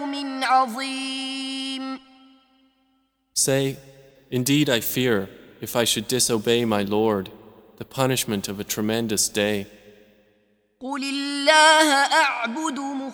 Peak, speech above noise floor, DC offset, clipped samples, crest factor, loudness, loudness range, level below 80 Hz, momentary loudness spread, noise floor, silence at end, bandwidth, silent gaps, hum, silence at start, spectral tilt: -2 dBFS; 46 dB; under 0.1%; under 0.1%; 22 dB; -21 LUFS; 7 LU; -60 dBFS; 15 LU; -68 dBFS; 0 s; over 20 kHz; none; none; 0 s; -3 dB/octave